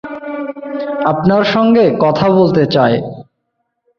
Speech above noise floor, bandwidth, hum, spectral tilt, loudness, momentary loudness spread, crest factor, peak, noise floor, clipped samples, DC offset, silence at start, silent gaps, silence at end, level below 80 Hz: 59 dB; 6.6 kHz; none; -8 dB/octave; -13 LUFS; 13 LU; 12 dB; 0 dBFS; -70 dBFS; under 0.1%; under 0.1%; 0.05 s; none; 0.75 s; -50 dBFS